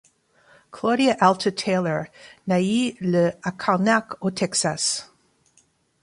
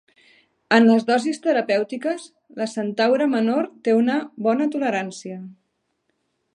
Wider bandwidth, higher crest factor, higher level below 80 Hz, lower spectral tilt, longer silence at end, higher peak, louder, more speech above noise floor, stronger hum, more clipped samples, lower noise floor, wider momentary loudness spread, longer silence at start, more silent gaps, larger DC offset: about the same, 11.5 kHz vs 10.5 kHz; about the same, 20 dB vs 20 dB; first, -64 dBFS vs -78 dBFS; about the same, -4.5 dB/octave vs -5.5 dB/octave; about the same, 1 s vs 1.05 s; about the same, -2 dBFS vs 0 dBFS; about the same, -22 LUFS vs -21 LUFS; second, 41 dB vs 52 dB; neither; neither; second, -63 dBFS vs -72 dBFS; second, 9 LU vs 15 LU; about the same, 0.75 s vs 0.7 s; neither; neither